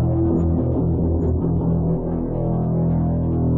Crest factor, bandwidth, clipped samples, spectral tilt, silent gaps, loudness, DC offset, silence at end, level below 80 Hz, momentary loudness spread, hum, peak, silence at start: 10 dB; 2 kHz; under 0.1%; -14 dB/octave; none; -21 LUFS; 0.7%; 0 s; -32 dBFS; 3 LU; none; -10 dBFS; 0 s